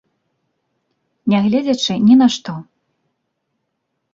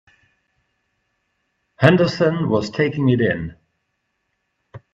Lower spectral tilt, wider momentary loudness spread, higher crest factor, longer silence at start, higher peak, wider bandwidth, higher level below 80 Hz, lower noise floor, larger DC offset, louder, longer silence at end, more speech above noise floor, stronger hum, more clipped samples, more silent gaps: second, -5.5 dB/octave vs -7.5 dB/octave; first, 16 LU vs 7 LU; second, 16 dB vs 22 dB; second, 1.25 s vs 1.8 s; about the same, -2 dBFS vs 0 dBFS; about the same, 7.6 kHz vs 8 kHz; second, -60 dBFS vs -54 dBFS; about the same, -73 dBFS vs -73 dBFS; neither; first, -15 LUFS vs -18 LUFS; first, 1.5 s vs 0.15 s; about the same, 59 dB vs 56 dB; neither; neither; neither